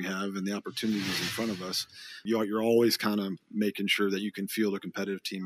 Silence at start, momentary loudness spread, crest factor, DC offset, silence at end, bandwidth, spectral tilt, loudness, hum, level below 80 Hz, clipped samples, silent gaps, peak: 0 s; 9 LU; 18 dB; under 0.1%; 0 s; 15.5 kHz; -4.5 dB/octave; -30 LUFS; none; -72 dBFS; under 0.1%; none; -12 dBFS